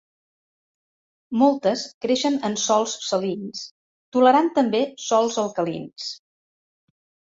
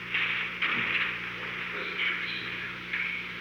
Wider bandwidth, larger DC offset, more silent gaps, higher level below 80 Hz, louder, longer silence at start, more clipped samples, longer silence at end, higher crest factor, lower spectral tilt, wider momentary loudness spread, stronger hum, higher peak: second, 8 kHz vs over 20 kHz; neither; first, 1.94-2.01 s, 3.71-4.12 s vs none; second, -68 dBFS vs -62 dBFS; first, -22 LUFS vs -30 LUFS; first, 1.3 s vs 0 s; neither; first, 1.2 s vs 0 s; about the same, 18 dB vs 16 dB; about the same, -4 dB/octave vs -3.5 dB/octave; first, 15 LU vs 7 LU; second, none vs 60 Hz at -55 dBFS; first, -4 dBFS vs -16 dBFS